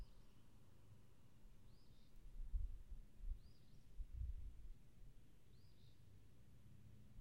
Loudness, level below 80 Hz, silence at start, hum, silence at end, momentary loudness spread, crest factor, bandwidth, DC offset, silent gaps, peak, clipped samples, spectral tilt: -59 LUFS; -56 dBFS; 0 s; none; 0 s; 16 LU; 22 dB; 15.5 kHz; under 0.1%; none; -34 dBFS; under 0.1%; -6.5 dB/octave